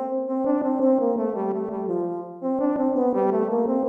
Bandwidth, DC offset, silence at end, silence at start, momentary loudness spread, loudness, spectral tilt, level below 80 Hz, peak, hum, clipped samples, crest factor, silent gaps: 3 kHz; under 0.1%; 0 s; 0 s; 7 LU; -24 LUFS; -11 dB/octave; -66 dBFS; -10 dBFS; none; under 0.1%; 14 dB; none